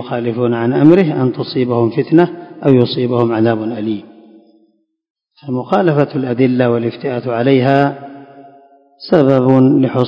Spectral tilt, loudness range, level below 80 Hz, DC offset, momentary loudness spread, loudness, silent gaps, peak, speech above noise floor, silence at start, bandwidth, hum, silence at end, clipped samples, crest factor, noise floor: -9.5 dB/octave; 5 LU; -58 dBFS; under 0.1%; 11 LU; -14 LUFS; 5.10-5.15 s; 0 dBFS; 45 dB; 0 s; 5.6 kHz; none; 0 s; 0.4%; 14 dB; -58 dBFS